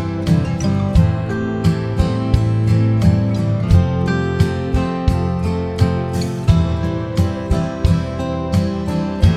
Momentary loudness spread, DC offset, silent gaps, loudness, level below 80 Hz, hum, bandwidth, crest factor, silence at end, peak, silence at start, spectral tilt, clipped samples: 5 LU; under 0.1%; none; -18 LUFS; -26 dBFS; none; 12.5 kHz; 16 dB; 0 s; 0 dBFS; 0 s; -8 dB/octave; under 0.1%